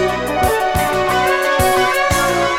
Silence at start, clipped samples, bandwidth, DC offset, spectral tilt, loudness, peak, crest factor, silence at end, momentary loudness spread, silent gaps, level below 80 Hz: 0 s; under 0.1%; 18 kHz; under 0.1%; -4 dB/octave; -15 LUFS; 0 dBFS; 14 dB; 0 s; 3 LU; none; -32 dBFS